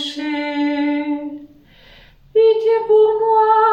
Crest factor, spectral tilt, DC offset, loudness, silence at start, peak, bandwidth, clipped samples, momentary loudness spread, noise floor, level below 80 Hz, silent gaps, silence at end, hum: 14 dB; -4.5 dB/octave; under 0.1%; -16 LUFS; 0 s; -4 dBFS; 7.8 kHz; under 0.1%; 11 LU; -46 dBFS; -56 dBFS; none; 0 s; none